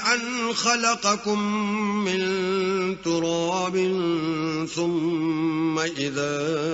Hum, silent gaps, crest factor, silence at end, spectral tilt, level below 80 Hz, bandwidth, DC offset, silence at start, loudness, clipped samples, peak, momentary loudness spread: none; none; 18 dB; 0 s; -3.5 dB/octave; -62 dBFS; 8 kHz; under 0.1%; 0 s; -24 LUFS; under 0.1%; -6 dBFS; 4 LU